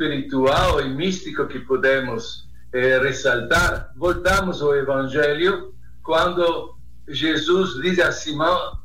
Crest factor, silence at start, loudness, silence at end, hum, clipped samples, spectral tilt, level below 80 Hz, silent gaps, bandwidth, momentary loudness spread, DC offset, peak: 14 dB; 0 s; -20 LUFS; 0.05 s; none; under 0.1%; -4.5 dB/octave; -38 dBFS; none; 16.5 kHz; 10 LU; 2%; -8 dBFS